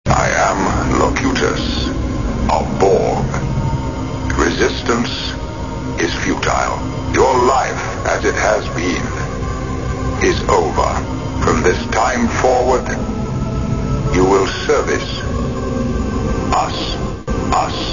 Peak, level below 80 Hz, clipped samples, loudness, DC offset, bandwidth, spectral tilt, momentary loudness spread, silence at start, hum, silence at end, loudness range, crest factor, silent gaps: 0 dBFS; -26 dBFS; under 0.1%; -17 LUFS; 1%; 7.4 kHz; -5 dB/octave; 8 LU; 0.05 s; none; 0 s; 2 LU; 16 dB; none